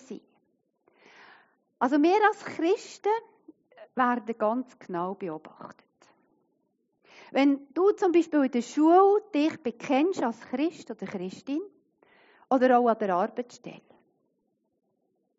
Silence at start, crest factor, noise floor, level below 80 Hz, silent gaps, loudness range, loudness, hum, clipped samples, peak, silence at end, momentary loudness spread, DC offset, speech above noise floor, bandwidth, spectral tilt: 0.1 s; 18 dB; -75 dBFS; -84 dBFS; none; 8 LU; -26 LUFS; none; under 0.1%; -10 dBFS; 1.6 s; 17 LU; under 0.1%; 50 dB; 7.6 kHz; -4 dB/octave